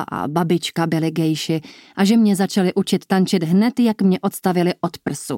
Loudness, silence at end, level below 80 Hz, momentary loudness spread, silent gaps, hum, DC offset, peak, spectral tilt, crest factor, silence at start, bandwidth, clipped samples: -19 LUFS; 0 s; -62 dBFS; 8 LU; none; none; under 0.1%; -4 dBFS; -6 dB/octave; 14 dB; 0 s; 16.5 kHz; under 0.1%